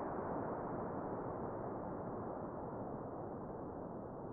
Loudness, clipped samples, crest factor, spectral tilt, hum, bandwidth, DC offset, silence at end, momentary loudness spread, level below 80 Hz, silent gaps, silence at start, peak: -45 LUFS; under 0.1%; 14 dB; -5.5 dB/octave; none; 2.8 kHz; under 0.1%; 0 s; 5 LU; -62 dBFS; none; 0 s; -30 dBFS